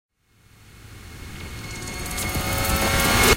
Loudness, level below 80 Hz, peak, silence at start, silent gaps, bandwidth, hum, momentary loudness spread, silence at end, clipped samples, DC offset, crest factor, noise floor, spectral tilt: -23 LUFS; -34 dBFS; -2 dBFS; 0.7 s; none; 17 kHz; none; 22 LU; 0 s; under 0.1%; under 0.1%; 22 dB; -56 dBFS; -3 dB/octave